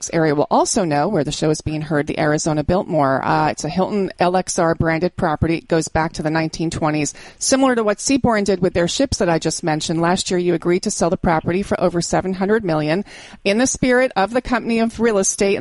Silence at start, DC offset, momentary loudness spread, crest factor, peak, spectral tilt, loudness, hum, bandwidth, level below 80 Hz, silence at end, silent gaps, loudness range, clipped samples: 0 s; under 0.1%; 5 LU; 16 dB; -2 dBFS; -4.5 dB/octave; -18 LUFS; none; 11.5 kHz; -40 dBFS; 0 s; none; 1 LU; under 0.1%